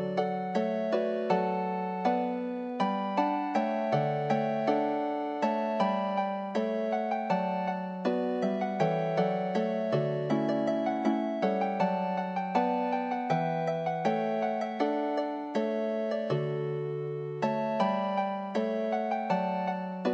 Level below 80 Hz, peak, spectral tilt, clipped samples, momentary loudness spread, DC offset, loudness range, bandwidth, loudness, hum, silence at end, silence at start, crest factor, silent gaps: -80 dBFS; -12 dBFS; -7.5 dB/octave; under 0.1%; 4 LU; under 0.1%; 2 LU; 8.4 kHz; -30 LUFS; none; 0 s; 0 s; 16 dB; none